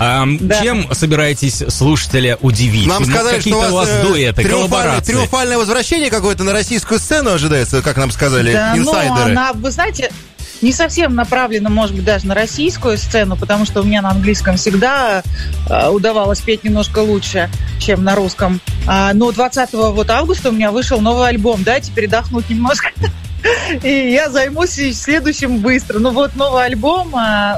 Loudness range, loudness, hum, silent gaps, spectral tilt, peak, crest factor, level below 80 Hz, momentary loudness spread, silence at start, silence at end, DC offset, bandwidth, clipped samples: 2 LU; -13 LUFS; none; none; -4.5 dB/octave; -2 dBFS; 12 dB; -26 dBFS; 4 LU; 0 s; 0 s; under 0.1%; 15.5 kHz; under 0.1%